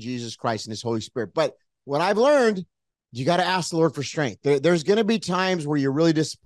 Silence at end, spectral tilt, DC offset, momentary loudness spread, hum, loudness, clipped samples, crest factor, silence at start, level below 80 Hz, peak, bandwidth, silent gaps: 0.1 s; -5.5 dB/octave; under 0.1%; 9 LU; none; -23 LUFS; under 0.1%; 16 dB; 0 s; -68 dBFS; -8 dBFS; 12.5 kHz; none